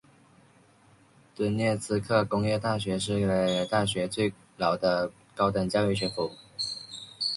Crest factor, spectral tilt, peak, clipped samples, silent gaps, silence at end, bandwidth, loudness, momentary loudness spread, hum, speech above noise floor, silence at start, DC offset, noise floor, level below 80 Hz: 18 dB; -5 dB/octave; -10 dBFS; under 0.1%; none; 0 s; 11.5 kHz; -28 LUFS; 7 LU; none; 33 dB; 1.4 s; under 0.1%; -59 dBFS; -56 dBFS